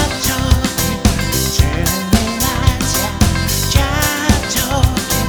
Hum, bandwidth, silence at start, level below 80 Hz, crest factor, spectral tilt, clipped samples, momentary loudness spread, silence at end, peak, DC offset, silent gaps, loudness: none; over 20 kHz; 0 s; -20 dBFS; 14 dB; -4 dB/octave; under 0.1%; 2 LU; 0 s; 0 dBFS; under 0.1%; none; -15 LUFS